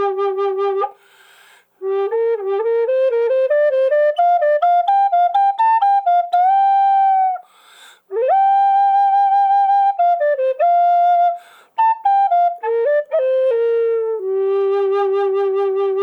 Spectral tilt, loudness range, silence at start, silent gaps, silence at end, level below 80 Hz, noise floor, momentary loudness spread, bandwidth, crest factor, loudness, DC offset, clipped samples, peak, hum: -3.5 dB/octave; 3 LU; 0 s; none; 0 s; -72 dBFS; -50 dBFS; 6 LU; 5.2 kHz; 10 dB; -16 LUFS; under 0.1%; under 0.1%; -6 dBFS; none